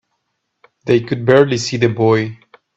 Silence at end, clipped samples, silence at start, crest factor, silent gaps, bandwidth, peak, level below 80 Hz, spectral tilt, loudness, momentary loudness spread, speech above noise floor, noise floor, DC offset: 0.4 s; under 0.1%; 0.85 s; 16 dB; none; 8 kHz; 0 dBFS; -54 dBFS; -6 dB/octave; -15 LUFS; 8 LU; 57 dB; -71 dBFS; under 0.1%